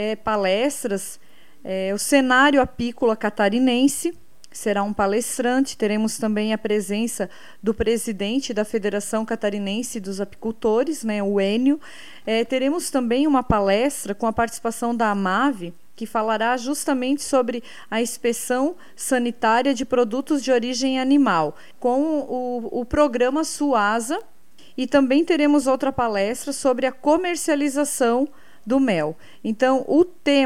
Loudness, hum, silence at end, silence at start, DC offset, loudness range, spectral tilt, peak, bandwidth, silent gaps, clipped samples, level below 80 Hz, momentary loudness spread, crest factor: -21 LUFS; none; 0 s; 0 s; 1%; 4 LU; -4 dB/octave; -4 dBFS; 15.5 kHz; none; under 0.1%; -48 dBFS; 10 LU; 18 dB